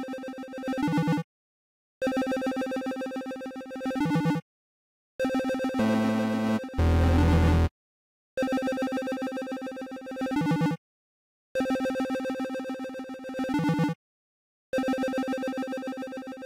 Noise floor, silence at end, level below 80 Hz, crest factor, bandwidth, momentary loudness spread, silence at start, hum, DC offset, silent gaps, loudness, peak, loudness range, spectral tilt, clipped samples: under -90 dBFS; 0 s; -40 dBFS; 14 dB; 16 kHz; 13 LU; 0 s; none; under 0.1%; 1.24-2.01 s, 4.42-5.19 s, 7.71-8.37 s, 10.78-11.55 s, 13.95-14.73 s; -29 LUFS; -14 dBFS; 5 LU; -7 dB/octave; under 0.1%